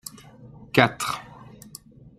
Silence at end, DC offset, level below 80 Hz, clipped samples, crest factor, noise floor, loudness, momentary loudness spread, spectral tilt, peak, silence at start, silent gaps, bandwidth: 0.75 s; under 0.1%; -60 dBFS; under 0.1%; 26 dB; -47 dBFS; -23 LUFS; 25 LU; -4.5 dB/octave; -2 dBFS; 0.4 s; none; 15.5 kHz